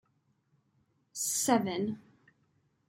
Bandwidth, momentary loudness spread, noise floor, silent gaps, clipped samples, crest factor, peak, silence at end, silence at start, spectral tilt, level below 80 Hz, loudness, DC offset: 16.5 kHz; 17 LU; -74 dBFS; none; under 0.1%; 24 dB; -12 dBFS; 0.9 s; 1.15 s; -3.5 dB/octave; -78 dBFS; -31 LUFS; under 0.1%